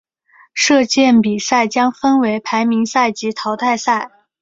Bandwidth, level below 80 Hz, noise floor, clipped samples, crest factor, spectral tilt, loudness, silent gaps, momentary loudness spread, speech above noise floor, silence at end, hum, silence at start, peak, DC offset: 7.8 kHz; -58 dBFS; -51 dBFS; under 0.1%; 14 dB; -3.5 dB/octave; -15 LUFS; none; 8 LU; 36 dB; 0.35 s; none; 0.55 s; -2 dBFS; under 0.1%